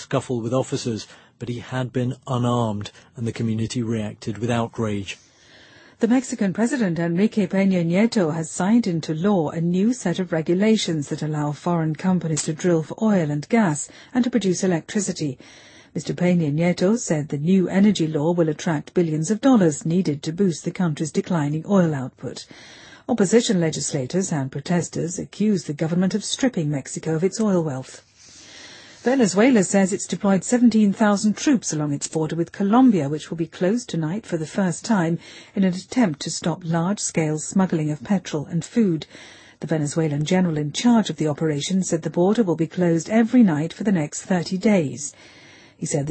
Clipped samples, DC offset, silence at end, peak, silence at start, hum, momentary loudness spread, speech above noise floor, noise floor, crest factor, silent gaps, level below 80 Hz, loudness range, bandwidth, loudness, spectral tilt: under 0.1%; under 0.1%; 0 s; -4 dBFS; 0 s; none; 11 LU; 29 dB; -50 dBFS; 16 dB; none; -60 dBFS; 5 LU; 8.8 kHz; -22 LUFS; -6 dB/octave